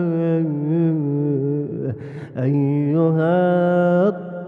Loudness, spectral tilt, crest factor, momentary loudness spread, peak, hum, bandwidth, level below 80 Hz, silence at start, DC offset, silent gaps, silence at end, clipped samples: -19 LUFS; -11 dB/octave; 12 dB; 9 LU; -6 dBFS; none; 3.8 kHz; -64 dBFS; 0 s; under 0.1%; none; 0 s; under 0.1%